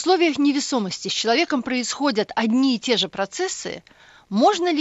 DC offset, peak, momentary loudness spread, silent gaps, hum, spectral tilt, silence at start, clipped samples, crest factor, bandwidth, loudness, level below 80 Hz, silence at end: under 0.1%; -6 dBFS; 8 LU; none; none; -3.5 dB/octave; 0 s; under 0.1%; 16 dB; 8.2 kHz; -21 LUFS; -64 dBFS; 0 s